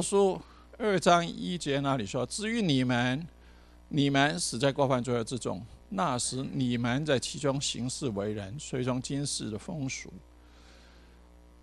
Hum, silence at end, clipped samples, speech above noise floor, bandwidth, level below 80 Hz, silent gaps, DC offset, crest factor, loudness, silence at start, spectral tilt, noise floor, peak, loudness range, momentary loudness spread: 60 Hz at -50 dBFS; 0.65 s; under 0.1%; 25 dB; 13 kHz; -56 dBFS; none; under 0.1%; 20 dB; -30 LUFS; 0 s; -4.5 dB/octave; -55 dBFS; -10 dBFS; 6 LU; 10 LU